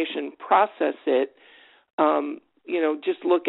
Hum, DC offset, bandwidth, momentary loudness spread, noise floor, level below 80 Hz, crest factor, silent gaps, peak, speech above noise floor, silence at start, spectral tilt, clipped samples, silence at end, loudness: none; under 0.1%; 4.1 kHz; 12 LU; -54 dBFS; -78 dBFS; 18 dB; 1.93-1.98 s; -6 dBFS; 30 dB; 0 s; -1.5 dB/octave; under 0.1%; 0 s; -24 LUFS